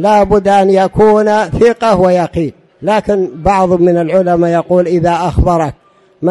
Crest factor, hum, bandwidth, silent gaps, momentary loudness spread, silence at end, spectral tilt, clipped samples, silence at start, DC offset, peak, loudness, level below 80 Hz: 10 dB; none; 11.5 kHz; none; 7 LU; 0 s; -7 dB/octave; under 0.1%; 0 s; under 0.1%; 0 dBFS; -11 LUFS; -28 dBFS